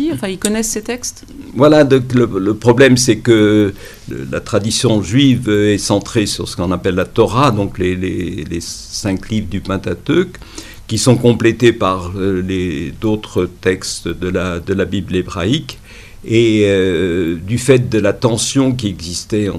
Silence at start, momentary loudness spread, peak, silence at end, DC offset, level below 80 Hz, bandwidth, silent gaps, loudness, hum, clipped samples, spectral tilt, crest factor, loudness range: 0 s; 12 LU; 0 dBFS; 0 s; under 0.1%; -38 dBFS; 15 kHz; none; -15 LUFS; none; under 0.1%; -5 dB/octave; 14 dB; 6 LU